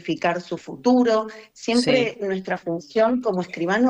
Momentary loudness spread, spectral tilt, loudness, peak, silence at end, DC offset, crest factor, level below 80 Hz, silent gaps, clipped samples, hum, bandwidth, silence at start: 10 LU; -5 dB/octave; -22 LUFS; -8 dBFS; 0 s; under 0.1%; 14 dB; -62 dBFS; none; under 0.1%; none; 10.5 kHz; 0.05 s